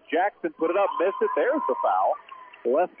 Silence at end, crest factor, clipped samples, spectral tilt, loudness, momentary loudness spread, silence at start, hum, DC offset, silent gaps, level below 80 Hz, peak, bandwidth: 0.15 s; 12 dB; under 0.1%; -8 dB/octave; -25 LUFS; 7 LU; 0.1 s; none; under 0.1%; none; -82 dBFS; -12 dBFS; 3.6 kHz